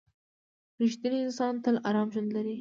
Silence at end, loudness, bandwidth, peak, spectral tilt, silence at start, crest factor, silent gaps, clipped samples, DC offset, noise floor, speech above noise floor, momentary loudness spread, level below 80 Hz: 0 s; -30 LUFS; 7.6 kHz; -16 dBFS; -6 dB/octave; 0.8 s; 14 dB; none; under 0.1%; under 0.1%; under -90 dBFS; over 61 dB; 4 LU; -80 dBFS